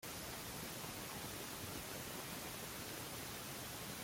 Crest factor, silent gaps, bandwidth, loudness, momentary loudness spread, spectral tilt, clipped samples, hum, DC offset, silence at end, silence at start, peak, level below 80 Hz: 14 dB; none; 16.5 kHz; -46 LUFS; 0 LU; -2.5 dB/octave; under 0.1%; none; under 0.1%; 0 s; 0 s; -34 dBFS; -66 dBFS